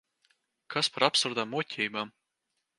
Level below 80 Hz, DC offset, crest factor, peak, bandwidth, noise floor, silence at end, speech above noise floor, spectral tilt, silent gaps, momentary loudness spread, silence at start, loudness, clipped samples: -80 dBFS; under 0.1%; 26 dB; -6 dBFS; 11.5 kHz; -82 dBFS; 0.7 s; 52 dB; -2.5 dB/octave; none; 11 LU; 0.7 s; -29 LUFS; under 0.1%